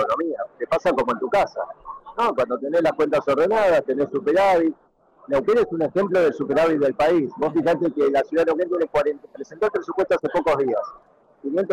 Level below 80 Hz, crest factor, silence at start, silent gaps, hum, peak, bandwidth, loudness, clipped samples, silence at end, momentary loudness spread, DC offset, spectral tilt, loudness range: -54 dBFS; 8 dB; 0 s; none; none; -14 dBFS; 13.5 kHz; -21 LUFS; under 0.1%; 0 s; 8 LU; under 0.1%; -6.5 dB/octave; 2 LU